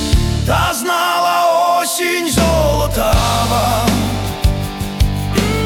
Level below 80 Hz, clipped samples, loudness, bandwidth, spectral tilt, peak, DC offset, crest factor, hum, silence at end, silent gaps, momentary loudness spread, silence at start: -22 dBFS; under 0.1%; -15 LUFS; 18 kHz; -4.5 dB/octave; -2 dBFS; under 0.1%; 12 dB; none; 0 s; none; 5 LU; 0 s